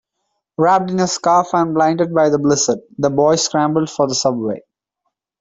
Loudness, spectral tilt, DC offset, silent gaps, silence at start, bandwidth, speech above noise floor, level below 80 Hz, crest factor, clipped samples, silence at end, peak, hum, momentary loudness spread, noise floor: -16 LUFS; -4.5 dB/octave; under 0.1%; none; 0.6 s; 8 kHz; 59 dB; -58 dBFS; 14 dB; under 0.1%; 0.8 s; -2 dBFS; none; 5 LU; -74 dBFS